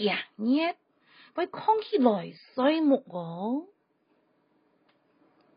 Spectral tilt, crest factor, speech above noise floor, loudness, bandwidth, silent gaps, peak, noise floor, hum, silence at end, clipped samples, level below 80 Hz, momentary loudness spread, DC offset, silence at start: -3.5 dB/octave; 22 dB; 44 dB; -28 LUFS; 5.2 kHz; none; -8 dBFS; -71 dBFS; none; 1.9 s; under 0.1%; -84 dBFS; 12 LU; under 0.1%; 0 s